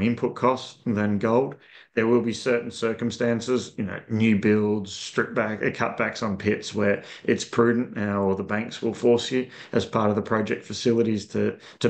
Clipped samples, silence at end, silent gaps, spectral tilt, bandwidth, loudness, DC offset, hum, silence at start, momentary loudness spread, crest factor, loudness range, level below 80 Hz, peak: under 0.1%; 0 s; none; -6 dB/octave; 9 kHz; -25 LUFS; under 0.1%; none; 0 s; 7 LU; 18 dB; 1 LU; -64 dBFS; -6 dBFS